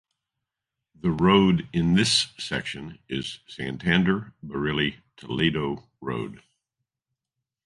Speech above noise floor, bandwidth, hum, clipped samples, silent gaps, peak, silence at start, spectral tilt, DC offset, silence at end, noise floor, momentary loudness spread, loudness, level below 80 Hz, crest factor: 61 dB; 11.5 kHz; none; under 0.1%; none; -6 dBFS; 1.05 s; -5 dB/octave; under 0.1%; 1.3 s; -86 dBFS; 15 LU; -25 LUFS; -50 dBFS; 22 dB